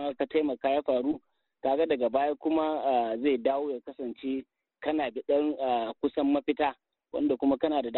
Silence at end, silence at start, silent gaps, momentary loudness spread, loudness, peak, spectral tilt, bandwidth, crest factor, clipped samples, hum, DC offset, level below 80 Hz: 0 s; 0 s; none; 9 LU; -29 LUFS; -14 dBFS; -3 dB/octave; 4.2 kHz; 16 dB; under 0.1%; none; under 0.1%; -66 dBFS